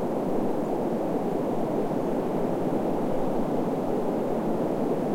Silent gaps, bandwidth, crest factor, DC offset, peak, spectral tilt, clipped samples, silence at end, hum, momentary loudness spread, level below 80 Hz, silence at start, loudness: none; 16.5 kHz; 14 dB; 1%; -14 dBFS; -8 dB/octave; under 0.1%; 0 s; none; 1 LU; -48 dBFS; 0 s; -28 LUFS